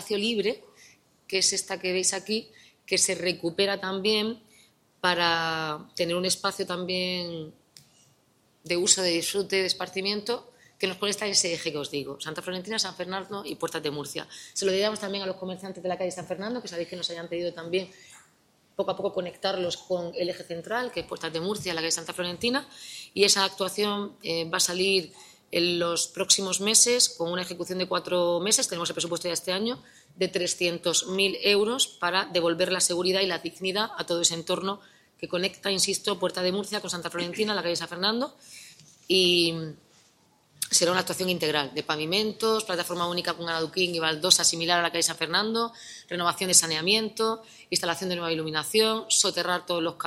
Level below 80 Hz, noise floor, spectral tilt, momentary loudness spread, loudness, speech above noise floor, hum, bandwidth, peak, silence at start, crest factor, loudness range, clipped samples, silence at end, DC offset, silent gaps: -70 dBFS; -65 dBFS; -2 dB/octave; 12 LU; -26 LUFS; 38 dB; none; 16 kHz; -4 dBFS; 0 s; 24 dB; 8 LU; under 0.1%; 0 s; under 0.1%; none